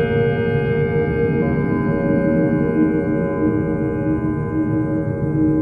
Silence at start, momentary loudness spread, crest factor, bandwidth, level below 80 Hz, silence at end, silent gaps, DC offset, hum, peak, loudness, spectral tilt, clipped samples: 0 s; 4 LU; 12 dB; 4.5 kHz; -36 dBFS; 0 s; none; under 0.1%; none; -6 dBFS; -19 LUFS; -10.5 dB/octave; under 0.1%